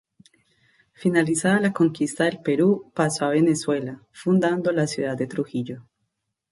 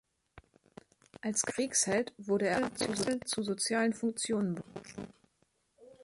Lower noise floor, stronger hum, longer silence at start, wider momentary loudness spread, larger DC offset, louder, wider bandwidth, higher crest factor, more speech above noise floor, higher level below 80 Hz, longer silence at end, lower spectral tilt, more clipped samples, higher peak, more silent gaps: about the same, -77 dBFS vs -75 dBFS; neither; first, 1 s vs 0.35 s; second, 9 LU vs 15 LU; neither; first, -23 LUFS vs -32 LUFS; about the same, 11.5 kHz vs 11.5 kHz; about the same, 18 dB vs 18 dB; first, 55 dB vs 42 dB; about the same, -66 dBFS vs -68 dBFS; first, 0.7 s vs 0.1 s; first, -5.5 dB/octave vs -3 dB/octave; neither; first, -6 dBFS vs -16 dBFS; neither